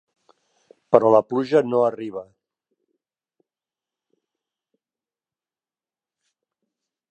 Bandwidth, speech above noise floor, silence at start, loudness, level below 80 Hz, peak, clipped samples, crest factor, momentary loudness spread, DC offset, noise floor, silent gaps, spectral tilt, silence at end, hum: 8.6 kHz; over 71 dB; 0.9 s; -19 LUFS; -74 dBFS; 0 dBFS; under 0.1%; 26 dB; 17 LU; under 0.1%; under -90 dBFS; none; -7.5 dB/octave; 4.9 s; none